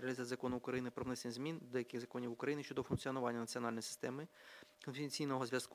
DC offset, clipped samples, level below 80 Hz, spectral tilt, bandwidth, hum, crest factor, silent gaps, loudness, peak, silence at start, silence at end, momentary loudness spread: under 0.1%; under 0.1%; -72 dBFS; -5 dB/octave; 16 kHz; none; 20 dB; none; -43 LUFS; -24 dBFS; 0 s; 0 s; 8 LU